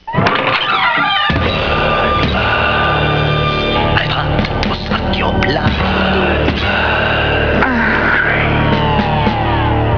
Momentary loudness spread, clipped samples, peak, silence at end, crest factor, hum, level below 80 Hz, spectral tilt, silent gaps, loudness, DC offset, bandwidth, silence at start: 3 LU; under 0.1%; 0 dBFS; 0 s; 14 dB; none; -24 dBFS; -7 dB/octave; none; -13 LUFS; under 0.1%; 5.4 kHz; 0.05 s